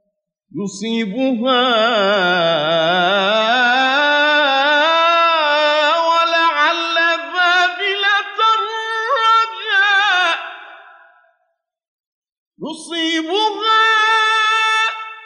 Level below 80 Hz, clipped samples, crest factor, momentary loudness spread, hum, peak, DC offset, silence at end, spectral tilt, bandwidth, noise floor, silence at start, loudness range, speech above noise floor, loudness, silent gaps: -74 dBFS; under 0.1%; 12 dB; 8 LU; none; -4 dBFS; under 0.1%; 0 s; -3 dB/octave; 11 kHz; -72 dBFS; 0.55 s; 6 LU; 56 dB; -14 LUFS; 11.88-12.22 s, 12.32-12.51 s